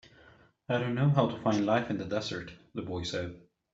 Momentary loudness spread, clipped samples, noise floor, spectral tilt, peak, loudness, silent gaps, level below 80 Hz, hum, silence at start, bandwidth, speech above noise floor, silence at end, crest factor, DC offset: 14 LU; under 0.1%; -60 dBFS; -6.5 dB/octave; -10 dBFS; -31 LUFS; none; -62 dBFS; none; 0.7 s; 7.8 kHz; 29 dB; 0.35 s; 20 dB; under 0.1%